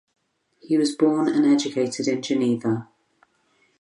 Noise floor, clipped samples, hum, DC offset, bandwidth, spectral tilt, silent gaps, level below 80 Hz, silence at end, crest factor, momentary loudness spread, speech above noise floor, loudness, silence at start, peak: -65 dBFS; under 0.1%; none; under 0.1%; 11 kHz; -5.5 dB/octave; none; -72 dBFS; 1 s; 16 dB; 6 LU; 44 dB; -22 LUFS; 0.7 s; -6 dBFS